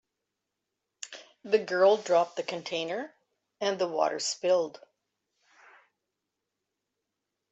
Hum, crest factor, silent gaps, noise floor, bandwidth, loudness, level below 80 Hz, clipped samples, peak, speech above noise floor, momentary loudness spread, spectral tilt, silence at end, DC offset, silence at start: none; 20 dB; none; -85 dBFS; 8.2 kHz; -28 LUFS; -84 dBFS; under 0.1%; -10 dBFS; 58 dB; 19 LU; -3 dB/octave; 2.8 s; under 0.1%; 1 s